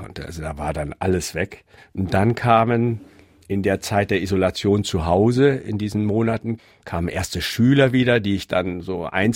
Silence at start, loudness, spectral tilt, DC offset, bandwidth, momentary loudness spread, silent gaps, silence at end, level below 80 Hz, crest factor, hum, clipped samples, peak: 0 s; -21 LUFS; -6 dB/octave; under 0.1%; 16.5 kHz; 13 LU; none; 0 s; -42 dBFS; 18 dB; none; under 0.1%; -2 dBFS